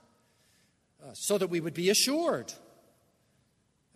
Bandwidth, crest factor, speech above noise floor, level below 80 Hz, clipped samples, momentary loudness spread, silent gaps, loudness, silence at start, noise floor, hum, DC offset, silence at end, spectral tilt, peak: 13.5 kHz; 22 dB; 43 dB; -78 dBFS; under 0.1%; 21 LU; none; -28 LUFS; 1.05 s; -72 dBFS; none; under 0.1%; 1.4 s; -3 dB/octave; -10 dBFS